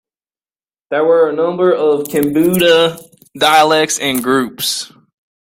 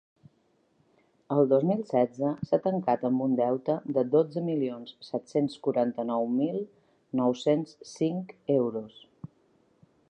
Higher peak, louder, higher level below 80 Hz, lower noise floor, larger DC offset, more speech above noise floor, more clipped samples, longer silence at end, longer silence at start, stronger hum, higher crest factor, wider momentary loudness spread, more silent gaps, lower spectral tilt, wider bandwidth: first, 0 dBFS vs -10 dBFS; first, -13 LUFS vs -28 LUFS; first, -54 dBFS vs -74 dBFS; first, under -90 dBFS vs -69 dBFS; neither; first, over 77 dB vs 41 dB; neither; second, 0.55 s vs 0.85 s; second, 0.9 s vs 1.3 s; neither; about the same, 14 dB vs 18 dB; second, 8 LU vs 13 LU; neither; second, -3.5 dB/octave vs -8 dB/octave; first, 16.5 kHz vs 9.4 kHz